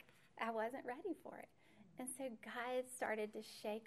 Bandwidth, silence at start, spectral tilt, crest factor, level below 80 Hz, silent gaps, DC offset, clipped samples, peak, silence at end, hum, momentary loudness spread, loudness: 14 kHz; 0 s; -3 dB/octave; 20 dB; -88 dBFS; none; under 0.1%; under 0.1%; -28 dBFS; 0 s; none; 15 LU; -46 LUFS